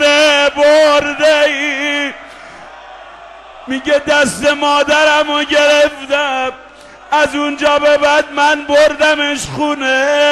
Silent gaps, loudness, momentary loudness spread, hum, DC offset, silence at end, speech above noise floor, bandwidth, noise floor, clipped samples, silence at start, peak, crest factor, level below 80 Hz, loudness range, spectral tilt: none; -12 LUFS; 8 LU; none; under 0.1%; 0 s; 23 dB; 12.5 kHz; -35 dBFS; under 0.1%; 0 s; -2 dBFS; 12 dB; -46 dBFS; 4 LU; -2 dB/octave